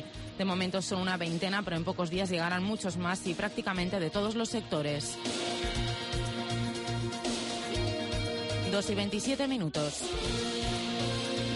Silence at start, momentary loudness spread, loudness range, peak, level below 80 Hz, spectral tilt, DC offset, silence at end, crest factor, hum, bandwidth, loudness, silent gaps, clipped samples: 0 s; 3 LU; 1 LU; -20 dBFS; -48 dBFS; -4.5 dB/octave; under 0.1%; 0 s; 14 dB; none; 11.5 kHz; -32 LUFS; none; under 0.1%